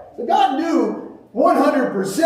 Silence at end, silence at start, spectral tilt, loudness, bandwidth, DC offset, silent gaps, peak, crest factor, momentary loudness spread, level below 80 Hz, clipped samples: 0 s; 0 s; -5 dB/octave; -18 LUFS; 15.5 kHz; under 0.1%; none; -4 dBFS; 14 dB; 10 LU; -64 dBFS; under 0.1%